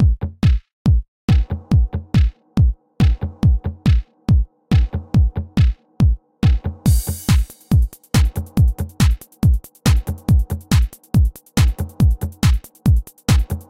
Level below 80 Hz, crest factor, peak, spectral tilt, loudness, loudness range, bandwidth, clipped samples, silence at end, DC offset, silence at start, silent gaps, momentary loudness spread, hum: -20 dBFS; 14 dB; -2 dBFS; -6.5 dB/octave; -19 LUFS; 0 LU; 16.5 kHz; under 0.1%; 0.1 s; under 0.1%; 0 s; 0.73-0.85 s, 1.08-1.28 s; 1 LU; none